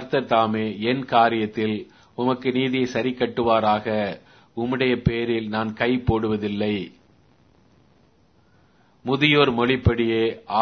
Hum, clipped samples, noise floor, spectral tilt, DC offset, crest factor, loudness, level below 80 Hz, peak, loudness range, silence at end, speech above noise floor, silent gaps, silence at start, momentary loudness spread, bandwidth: none; under 0.1%; -59 dBFS; -7 dB/octave; under 0.1%; 20 dB; -22 LUFS; -44 dBFS; -2 dBFS; 5 LU; 0 s; 38 dB; none; 0 s; 10 LU; 6.6 kHz